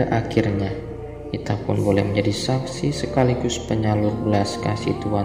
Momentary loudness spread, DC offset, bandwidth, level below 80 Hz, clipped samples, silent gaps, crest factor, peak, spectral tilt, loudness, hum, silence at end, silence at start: 8 LU; 0.1%; 15 kHz; -42 dBFS; under 0.1%; none; 18 dB; -4 dBFS; -6.5 dB/octave; -22 LUFS; none; 0 s; 0 s